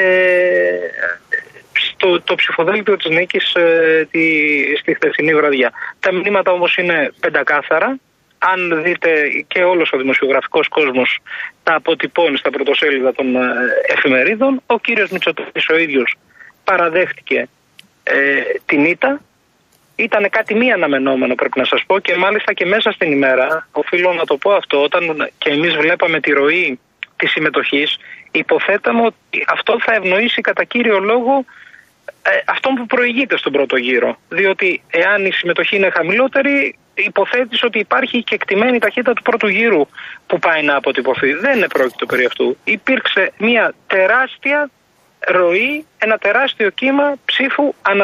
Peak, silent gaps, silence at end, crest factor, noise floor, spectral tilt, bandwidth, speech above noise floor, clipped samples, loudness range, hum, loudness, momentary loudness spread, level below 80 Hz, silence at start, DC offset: -2 dBFS; none; 0 s; 14 dB; -56 dBFS; -5.5 dB/octave; 13.5 kHz; 41 dB; under 0.1%; 2 LU; none; -14 LUFS; 6 LU; -64 dBFS; 0 s; under 0.1%